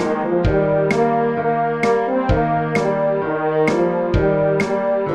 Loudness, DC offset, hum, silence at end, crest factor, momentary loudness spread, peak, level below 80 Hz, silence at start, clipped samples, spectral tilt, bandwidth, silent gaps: -18 LUFS; 0.2%; none; 0 s; 14 dB; 2 LU; -4 dBFS; -32 dBFS; 0 s; under 0.1%; -7.5 dB/octave; 10.5 kHz; none